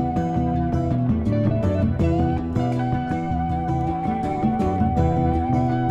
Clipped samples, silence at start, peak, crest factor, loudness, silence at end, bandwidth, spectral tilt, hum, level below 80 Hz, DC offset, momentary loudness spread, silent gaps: under 0.1%; 0 s; -8 dBFS; 14 dB; -22 LUFS; 0 s; 8 kHz; -9.5 dB/octave; none; -32 dBFS; under 0.1%; 4 LU; none